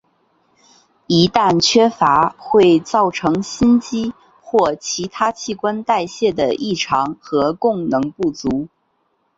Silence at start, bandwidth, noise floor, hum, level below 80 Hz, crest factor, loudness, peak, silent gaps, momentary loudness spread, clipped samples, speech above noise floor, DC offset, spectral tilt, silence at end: 1.1 s; 7.8 kHz; -65 dBFS; none; -50 dBFS; 16 dB; -17 LUFS; 0 dBFS; none; 9 LU; under 0.1%; 49 dB; under 0.1%; -5 dB/octave; 0.7 s